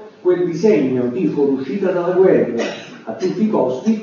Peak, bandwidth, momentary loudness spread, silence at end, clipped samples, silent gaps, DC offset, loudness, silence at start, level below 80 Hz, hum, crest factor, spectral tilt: -2 dBFS; 7.2 kHz; 10 LU; 0 s; under 0.1%; none; under 0.1%; -17 LUFS; 0 s; -66 dBFS; none; 14 dB; -7.5 dB/octave